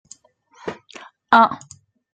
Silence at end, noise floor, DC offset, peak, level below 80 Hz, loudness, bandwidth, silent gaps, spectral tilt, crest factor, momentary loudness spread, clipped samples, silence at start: 0.55 s; -53 dBFS; under 0.1%; -2 dBFS; -68 dBFS; -16 LUFS; 9.2 kHz; none; -4 dB/octave; 20 dB; 21 LU; under 0.1%; 0.65 s